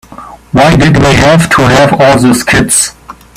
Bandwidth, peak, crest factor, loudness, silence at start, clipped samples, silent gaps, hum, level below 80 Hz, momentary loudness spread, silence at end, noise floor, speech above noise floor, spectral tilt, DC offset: over 20 kHz; 0 dBFS; 6 dB; -6 LUFS; 0.1 s; 0.5%; none; none; -26 dBFS; 3 LU; 0.25 s; -29 dBFS; 24 dB; -4.5 dB/octave; under 0.1%